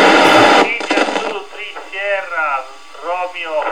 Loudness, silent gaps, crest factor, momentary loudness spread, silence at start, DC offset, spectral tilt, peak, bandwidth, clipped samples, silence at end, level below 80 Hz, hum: -14 LUFS; none; 14 dB; 19 LU; 0 s; 1%; -3 dB/octave; 0 dBFS; 17.5 kHz; under 0.1%; 0 s; -54 dBFS; none